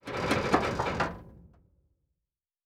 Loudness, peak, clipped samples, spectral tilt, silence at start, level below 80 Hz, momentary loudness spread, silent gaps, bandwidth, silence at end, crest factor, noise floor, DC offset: -29 LUFS; -10 dBFS; under 0.1%; -5 dB/octave; 0.05 s; -50 dBFS; 7 LU; none; 16.5 kHz; 1.2 s; 24 dB; -89 dBFS; under 0.1%